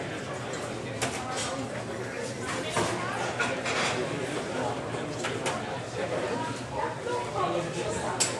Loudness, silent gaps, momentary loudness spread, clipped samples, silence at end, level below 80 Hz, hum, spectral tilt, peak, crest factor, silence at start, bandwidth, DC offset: -31 LUFS; none; 7 LU; under 0.1%; 0 s; -56 dBFS; none; -3.5 dB/octave; -10 dBFS; 22 dB; 0 s; 13 kHz; under 0.1%